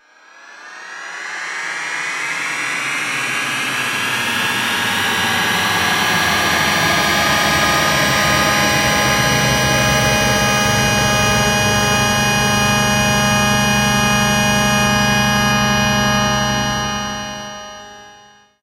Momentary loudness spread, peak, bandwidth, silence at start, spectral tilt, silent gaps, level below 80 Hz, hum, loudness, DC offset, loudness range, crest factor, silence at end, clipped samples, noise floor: 9 LU; -2 dBFS; 16 kHz; 0.45 s; -3 dB/octave; none; -36 dBFS; none; -15 LUFS; under 0.1%; 5 LU; 14 dB; 0.5 s; under 0.1%; -46 dBFS